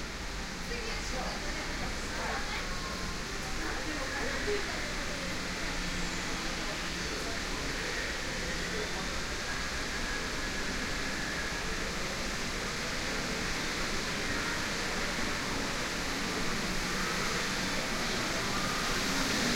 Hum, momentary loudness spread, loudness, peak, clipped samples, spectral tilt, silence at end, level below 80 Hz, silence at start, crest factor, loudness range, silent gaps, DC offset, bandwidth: none; 4 LU; -33 LUFS; -18 dBFS; under 0.1%; -2.5 dB/octave; 0 s; -42 dBFS; 0 s; 16 dB; 3 LU; none; under 0.1%; 16 kHz